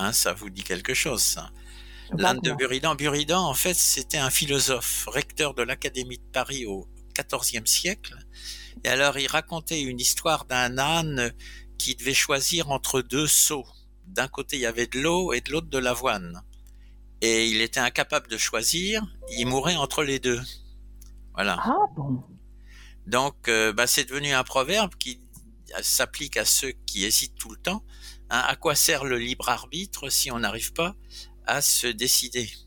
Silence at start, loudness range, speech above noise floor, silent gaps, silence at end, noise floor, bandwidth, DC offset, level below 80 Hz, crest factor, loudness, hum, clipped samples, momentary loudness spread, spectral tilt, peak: 0 s; 4 LU; 22 dB; none; 0 s; -47 dBFS; 18 kHz; under 0.1%; -46 dBFS; 24 dB; -24 LUFS; 50 Hz at -45 dBFS; under 0.1%; 12 LU; -2 dB/octave; -2 dBFS